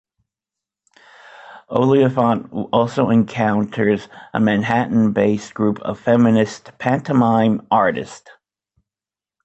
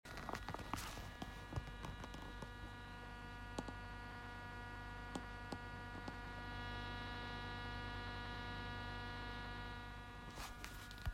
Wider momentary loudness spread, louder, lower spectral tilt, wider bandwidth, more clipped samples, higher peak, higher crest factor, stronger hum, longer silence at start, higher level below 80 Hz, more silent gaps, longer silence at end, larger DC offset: first, 8 LU vs 5 LU; first, -18 LUFS vs -49 LUFS; first, -7.5 dB/octave vs -4.5 dB/octave; second, 8.2 kHz vs 16 kHz; neither; first, -4 dBFS vs -26 dBFS; second, 16 dB vs 24 dB; second, none vs 50 Hz at -55 dBFS; first, 1.5 s vs 0.05 s; about the same, -56 dBFS vs -56 dBFS; neither; first, 1.25 s vs 0 s; neither